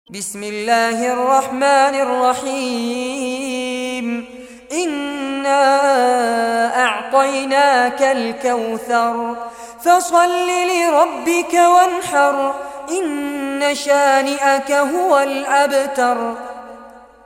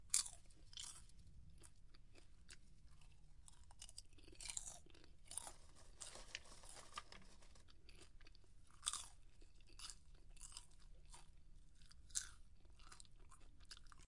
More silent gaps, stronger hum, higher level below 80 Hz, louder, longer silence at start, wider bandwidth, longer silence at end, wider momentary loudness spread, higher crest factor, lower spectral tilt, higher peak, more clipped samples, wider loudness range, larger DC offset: neither; neither; about the same, -60 dBFS vs -64 dBFS; first, -16 LUFS vs -52 LUFS; about the same, 0.1 s vs 0 s; first, 16.5 kHz vs 11.5 kHz; first, 0.3 s vs 0 s; second, 11 LU vs 21 LU; second, 14 dB vs 38 dB; first, -2 dB/octave vs 0 dB/octave; first, -2 dBFS vs -16 dBFS; neither; second, 4 LU vs 7 LU; neither